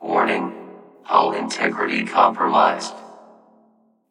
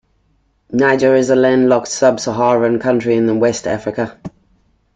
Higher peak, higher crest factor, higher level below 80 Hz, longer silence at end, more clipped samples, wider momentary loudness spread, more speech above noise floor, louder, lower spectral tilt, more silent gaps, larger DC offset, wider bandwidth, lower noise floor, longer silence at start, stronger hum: about the same, -2 dBFS vs -2 dBFS; first, 20 dB vs 14 dB; second, -82 dBFS vs -52 dBFS; first, 0.95 s vs 0.7 s; neither; first, 15 LU vs 11 LU; second, 40 dB vs 46 dB; second, -19 LUFS vs -14 LUFS; about the same, -4 dB/octave vs -5 dB/octave; neither; neither; first, 11.5 kHz vs 9.2 kHz; about the same, -59 dBFS vs -59 dBFS; second, 0 s vs 0.7 s; neither